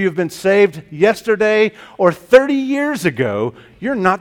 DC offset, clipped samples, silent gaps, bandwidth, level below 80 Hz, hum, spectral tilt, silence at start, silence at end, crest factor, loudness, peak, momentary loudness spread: under 0.1%; 0.1%; none; 17 kHz; -54 dBFS; none; -6 dB/octave; 0 s; 0 s; 16 dB; -15 LUFS; 0 dBFS; 8 LU